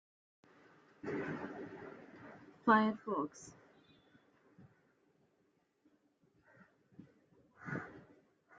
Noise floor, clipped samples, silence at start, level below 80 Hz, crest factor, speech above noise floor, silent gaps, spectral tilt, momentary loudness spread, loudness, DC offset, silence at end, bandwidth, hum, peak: -77 dBFS; under 0.1%; 1.05 s; -82 dBFS; 28 dB; 42 dB; none; -4.5 dB/octave; 25 LU; -37 LUFS; under 0.1%; 0.6 s; 7.6 kHz; none; -16 dBFS